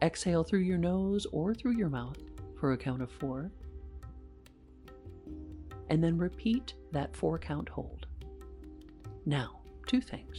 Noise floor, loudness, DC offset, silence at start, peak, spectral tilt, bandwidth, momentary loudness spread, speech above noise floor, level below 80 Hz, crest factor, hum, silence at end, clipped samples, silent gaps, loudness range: -56 dBFS; -34 LUFS; under 0.1%; 0 s; -14 dBFS; -6.5 dB/octave; 11.5 kHz; 20 LU; 23 dB; -50 dBFS; 20 dB; none; 0 s; under 0.1%; none; 7 LU